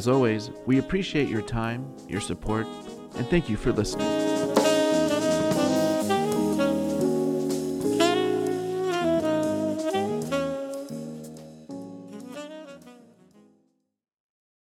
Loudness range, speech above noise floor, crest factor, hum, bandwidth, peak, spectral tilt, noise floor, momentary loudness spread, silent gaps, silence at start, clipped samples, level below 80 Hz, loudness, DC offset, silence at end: 15 LU; 43 dB; 20 dB; none; 16.5 kHz; -6 dBFS; -5.5 dB/octave; -69 dBFS; 17 LU; none; 0 s; under 0.1%; -48 dBFS; -26 LUFS; under 0.1%; 1.8 s